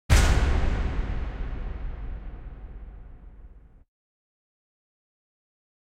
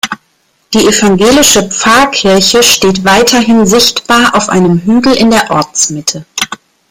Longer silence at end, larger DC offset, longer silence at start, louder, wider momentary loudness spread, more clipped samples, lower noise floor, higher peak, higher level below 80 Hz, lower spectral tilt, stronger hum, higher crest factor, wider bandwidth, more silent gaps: first, 2.4 s vs 0.35 s; neither; about the same, 0.1 s vs 0.05 s; second, -28 LUFS vs -7 LUFS; first, 25 LU vs 11 LU; second, under 0.1% vs 0.4%; second, -48 dBFS vs -54 dBFS; second, -6 dBFS vs 0 dBFS; first, -30 dBFS vs -38 dBFS; first, -5 dB/octave vs -3 dB/octave; neither; first, 22 dB vs 8 dB; second, 15.5 kHz vs over 20 kHz; neither